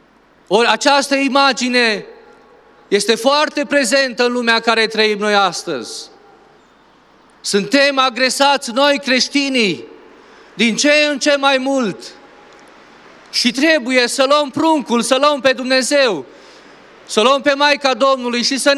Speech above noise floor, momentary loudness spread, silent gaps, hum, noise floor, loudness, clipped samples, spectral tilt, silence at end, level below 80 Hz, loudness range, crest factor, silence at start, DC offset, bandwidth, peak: 36 dB; 7 LU; none; none; -50 dBFS; -14 LUFS; under 0.1%; -2.5 dB/octave; 0 s; -66 dBFS; 3 LU; 16 dB; 0.5 s; under 0.1%; 14 kHz; 0 dBFS